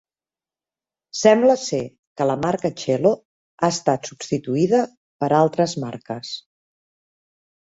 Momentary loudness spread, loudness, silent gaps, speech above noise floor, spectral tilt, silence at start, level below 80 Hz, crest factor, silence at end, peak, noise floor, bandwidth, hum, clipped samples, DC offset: 14 LU; -21 LUFS; 1.99-2.16 s, 3.25-3.58 s, 4.97-5.19 s; over 70 dB; -5.5 dB/octave; 1.15 s; -62 dBFS; 20 dB; 1.25 s; -2 dBFS; under -90 dBFS; 8 kHz; none; under 0.1%; under 0.1%